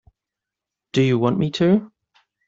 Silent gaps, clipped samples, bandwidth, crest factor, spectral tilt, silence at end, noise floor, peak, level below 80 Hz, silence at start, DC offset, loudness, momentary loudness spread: none; under 0.1%; 7.8 kHz; 18 dB; -7.5 dB/octave; 0.6 s; -86 dBFS; -4 dBFS; -58 dBFS; 0.95 s; under 0.1%; -20 LUFS; 3 LU